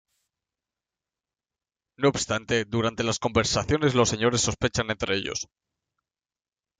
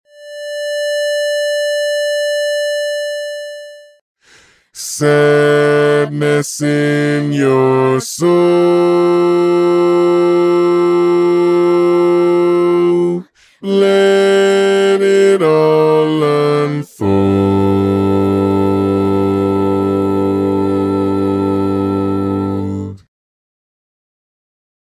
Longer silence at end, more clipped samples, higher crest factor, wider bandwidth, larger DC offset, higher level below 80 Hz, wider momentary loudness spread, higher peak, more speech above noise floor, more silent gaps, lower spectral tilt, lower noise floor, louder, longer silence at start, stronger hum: second, 1.35 s vs 1.9 s; neither; first, 20 dB vs 12 dB; second, 9.6 kHz vs 15.5 kHz; neither; second, -50 dBFS vs -42 dBFS; about the same, 6 LU vs 8 LU; second, -8 dBFS vs 0 dBFS; first, over 65 dB vs 36 dB; second, none vs 4.01-4.15 s; second, -4 dB/octave vs -6 dB/octave; first, under -90 dBFS vs -48 dBFS; second, -25 LUFS vs -13 LUFS; first, 2 s vs 0.2 s; neither